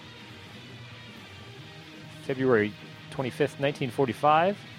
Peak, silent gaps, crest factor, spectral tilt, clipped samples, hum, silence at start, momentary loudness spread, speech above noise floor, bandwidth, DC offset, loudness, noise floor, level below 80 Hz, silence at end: -10 dBFS; none; 20 dB; -6.5 dB/octave; under 0.1%; none; 0 s; 22 LU; 19 dB; 15.5 kHz; under 0.1%; -26 LUFS; -46 dBFS; -66 dBFS; 0 s